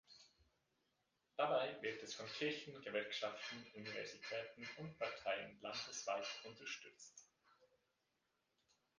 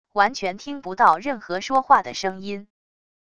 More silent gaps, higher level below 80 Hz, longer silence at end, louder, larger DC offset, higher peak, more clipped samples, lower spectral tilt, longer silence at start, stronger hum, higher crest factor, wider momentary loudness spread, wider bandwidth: neither; second, -86 dBFS vs -60 dBFS; first, 1.35 s vs 0.75 s; second, -46 LUFS vs -21 LUFS; second, under 0.1% vs 0.4%; second, -24 dBFS vs -2 dBFS; neither; about the same, -3 dB/octave vs -3.5 dB/octave; about the same, 0.1 s vs 0.15 s; neither; about the same, 24 dB vs 20 dB; second, 12 LU vs 15 LU; about the same, 10 kHz vs 11 kHz